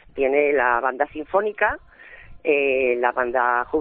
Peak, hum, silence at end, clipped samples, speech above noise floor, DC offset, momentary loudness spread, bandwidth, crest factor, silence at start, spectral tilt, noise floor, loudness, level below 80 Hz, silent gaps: -4 dBFS; none; 0 s; under 0.1%; 22 dB; under 0.1%; 5 LU; 3.8 kHz; 18 dB; 0.15 s; -2 dB/octave; -43 dBFS; -21 LUFS; -50 dBFS; none